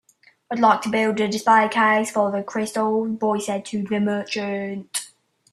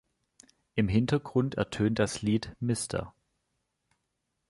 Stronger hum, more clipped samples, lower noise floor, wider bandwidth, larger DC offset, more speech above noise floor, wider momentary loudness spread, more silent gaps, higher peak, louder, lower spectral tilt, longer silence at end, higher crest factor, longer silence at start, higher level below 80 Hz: neither; neither; second, -49 dBFS vs -81 dBFS; first, 13 kHz vs 11.5 kHz; neither; second, 28 dB vs 53 dB; first, 11 LU vs 8 LU; neither; first, -4 dBFS vs -14 dBFS; first, -21 LUFS vs -30 LUFS; second, -4.5 dB/octave vs -6 dB/octave; second, 0.45 s vs 1.4 s; about the same, 18 dB vs 18 dB; second, 0.5 s vs 0.75 s; second, -68 dBFS vs -52 dBFS